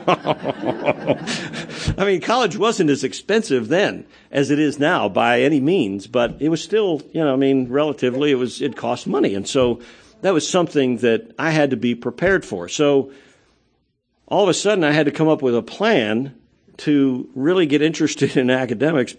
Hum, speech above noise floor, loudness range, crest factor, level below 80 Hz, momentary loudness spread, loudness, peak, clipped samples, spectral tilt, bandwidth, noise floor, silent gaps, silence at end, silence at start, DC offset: none; 49 dB; 2 LU; 18 dB; -50 dBFS; 7 LU; -19 LUFS; 0 dBFS; under 0.1%; -5 dB/octave; 9.8 kHz; -67 dBFS; none; 0.05 s; 0 s; under 0.1%